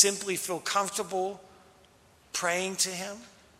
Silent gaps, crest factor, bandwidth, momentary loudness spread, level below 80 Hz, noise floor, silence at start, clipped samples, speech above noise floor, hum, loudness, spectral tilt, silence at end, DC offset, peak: none; 28 dB; 16 kHz; 11 LU; -72 dBFS; -60 dBFS; 0 s; under 0.1%; 29 dB; none; -30 LUFS; -1.5 dB/octave; 0.3 s; under 0.1%; -4 dBFS